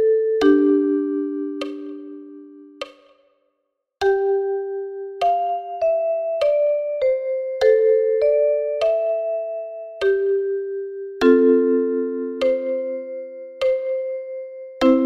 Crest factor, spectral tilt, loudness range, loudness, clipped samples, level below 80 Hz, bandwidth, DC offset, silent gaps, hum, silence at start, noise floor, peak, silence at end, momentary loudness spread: 18 dB; -5 dB/octave; 7 LU; -20 LUFS; under 0.1%; -58 dBFS; 8.6 kHz; under 0.1%; none; none; 0 s; -75 dBFS; -2 dBFS; 0 s; 17 LU